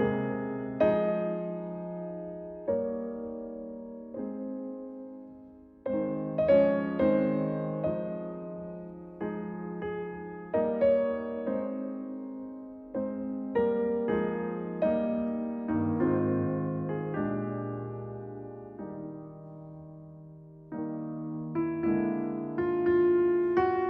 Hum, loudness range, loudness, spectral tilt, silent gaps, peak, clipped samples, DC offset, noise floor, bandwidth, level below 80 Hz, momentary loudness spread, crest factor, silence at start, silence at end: none; 9 LU; -31 LUFS; -11 dB/octave; none; -12 dBFS; under 0.1%; under 0.1%; -52 dBFS; 4.9 kHz; -60 dBFS; 17 LU; 18 dB; 0 s; 0 s